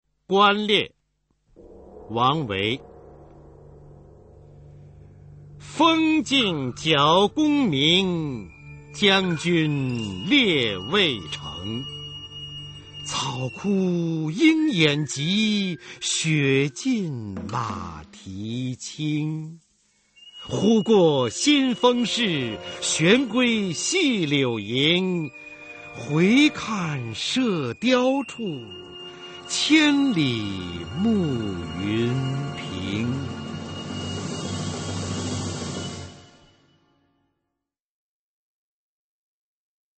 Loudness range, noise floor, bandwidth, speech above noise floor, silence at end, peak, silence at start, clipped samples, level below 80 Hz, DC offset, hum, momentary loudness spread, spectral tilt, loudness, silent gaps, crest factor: 10 LU; -84 dBFS; 8.8 kHz; 62 dB; 3.75 s; -4 dBFS; 0.3 s; under 0.1%; -56 dBFS; under 0.1%; none; 17 LU; -4.5 dB/octave; -22 LUFS; none; 20 dB